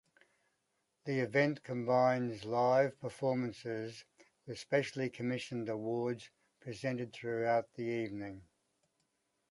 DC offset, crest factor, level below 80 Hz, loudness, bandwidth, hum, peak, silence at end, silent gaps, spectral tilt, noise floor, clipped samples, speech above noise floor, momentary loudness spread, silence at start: under 0.1%; 18 dB; -76 dBFS; -35 LUFS; 11.5 kHz; none; -18 dBFS; 1.1 s; none; -6.5 dB/octave; -82 dBFS; under 0.1%; 47 dB; 17 LU; 1.05 s